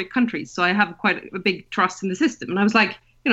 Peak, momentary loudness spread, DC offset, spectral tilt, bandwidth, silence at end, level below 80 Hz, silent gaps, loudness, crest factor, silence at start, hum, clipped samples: -4 dBFS; 6 LU; under 0.1%; -5 dB/octave; 8.2 kHz; 0 s; -60 dBFS; none; -21 LUFS; 18 dB; 0 s; none; under 0.1%